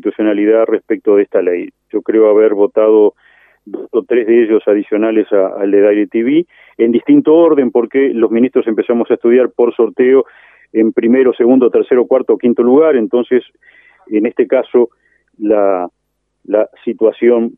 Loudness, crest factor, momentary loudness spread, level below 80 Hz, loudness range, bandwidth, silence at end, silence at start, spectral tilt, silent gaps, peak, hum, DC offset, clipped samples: -12 LUFS; 12 dB; 8 LU; -64 dBFS; 3 LU; 3.7 kHz; 0.05 s; 0.05 s; -10 dB/octave; none; 0 dBFS; none; under 0.1%; under 0.1%